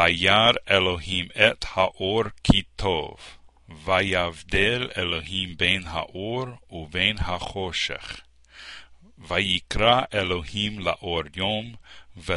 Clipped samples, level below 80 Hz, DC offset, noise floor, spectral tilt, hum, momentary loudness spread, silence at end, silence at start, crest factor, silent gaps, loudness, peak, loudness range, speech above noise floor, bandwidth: under 0.1%; -42 dBFS; under 0.1%; -46 dBFS; -4.5 dB/octave; none; 16 LU; 0 s; 0 s; 24 dB; none; -23 LUFS; 0 dBFS; 4 LU; 22 dB; 11.5 kHz